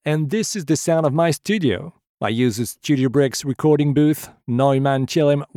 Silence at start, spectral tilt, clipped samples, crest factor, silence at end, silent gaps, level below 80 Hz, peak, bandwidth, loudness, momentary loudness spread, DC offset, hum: 0.05 s; -6 dB/octave; under 0.1%; 14 dB; 0.1 s; 2.09-2.18 s; -60 dBFS; -4 dBFS; 17.5 kHz; -19 LUFS; 8 LU; under 0.1%; none